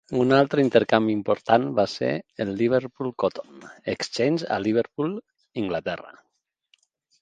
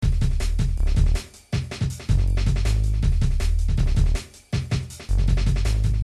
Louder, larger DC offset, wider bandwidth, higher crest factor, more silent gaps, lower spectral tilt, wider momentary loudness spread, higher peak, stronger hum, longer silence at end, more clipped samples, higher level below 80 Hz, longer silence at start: about the same, -24 LUFS vs -24 LUFS; neither; second, 9.4 kHz vs 12 kHz; first, 24 dB vs 14 dB; neither; about the same, -6 dB/octave vs -6 dB/octave; first, 13 LU vs 7 LU; first, 0 dBFS vs -6 dBFS; neither; first, 1.1 s vs 0 s; neither; second, -62 dBFS vs -22 dBFS; about the same, 0.1 s vs 0 s